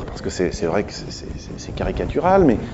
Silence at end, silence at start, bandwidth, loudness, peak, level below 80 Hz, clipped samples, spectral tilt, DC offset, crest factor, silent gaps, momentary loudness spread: 0 s; 0 s; 8 kHz; -20 LUFS; -2 dBFS; -34 dBFS; under 0.1%; -6 dB/octave; under 0.1%; 18 dB; none; 17 LU